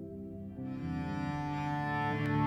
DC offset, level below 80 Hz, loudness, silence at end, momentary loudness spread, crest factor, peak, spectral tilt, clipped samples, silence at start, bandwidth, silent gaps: under 0.1%; -54 dBFS; -36 LUFS; 0 s; 11 LU; 16 dB; -20 dBFS; -8 dB/octave; under 0.1%; 0 s; 9.2 kHz; none